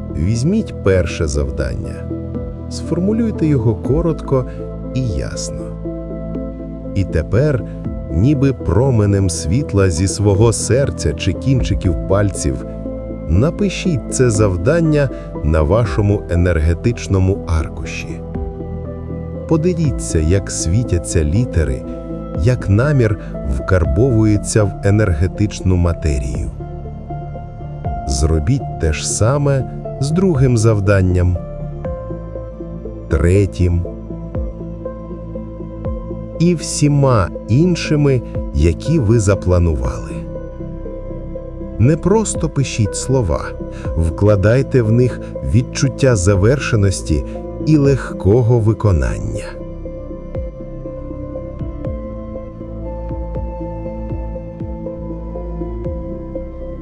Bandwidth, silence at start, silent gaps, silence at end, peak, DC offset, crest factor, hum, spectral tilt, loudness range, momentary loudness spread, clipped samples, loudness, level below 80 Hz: 12 kHz; 0 s; none; 0 s; 0 dBFS; under 0.1%; 16 dB; none; -6.5 dB/octave; 7 LU; 14 LU; under 0.1%; -17 LUFS; -28 dBFS